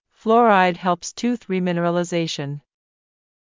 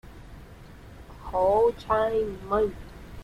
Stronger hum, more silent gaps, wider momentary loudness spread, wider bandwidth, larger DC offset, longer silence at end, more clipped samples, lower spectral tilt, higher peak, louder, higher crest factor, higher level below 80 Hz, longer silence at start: neither; neither; second, 12 LU vs 25 LU; second, 7.6 kHz vs 14.5 kHz; neither; first, 0.9 s vs 0 s; neither; second, -5.5 dB/octave vs -7 dB/octave; first, -4 dBFS vs -12 dBFS; first, -20 LUFS vs -25 LUFS; about the same, 18 dB vs 16 dB; second, -66 dBFS vs -46 dBFS; first, 0.25 s vs 0.05 s